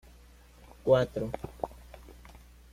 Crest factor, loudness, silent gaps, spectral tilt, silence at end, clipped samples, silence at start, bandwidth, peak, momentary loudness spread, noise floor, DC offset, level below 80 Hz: 22 dB; -31 LUFS; none; -7 dB/octave; 0.6 s; under 0.1%; 0.85 s; 15.5 kHz; -10 dBFS; 26 LU; -55 dBFS; under 0.1%; -52 dBFS